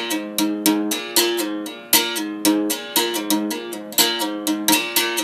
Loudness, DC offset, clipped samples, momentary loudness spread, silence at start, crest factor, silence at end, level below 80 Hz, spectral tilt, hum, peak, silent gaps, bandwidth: -19 LUFS; under 0.1%; under 0.1%; 7 LU; 0 s; 20 dB; 0 s; -70 dBFS; -1.5 dB/octave; none; 0 dBFS; none; 16 kHz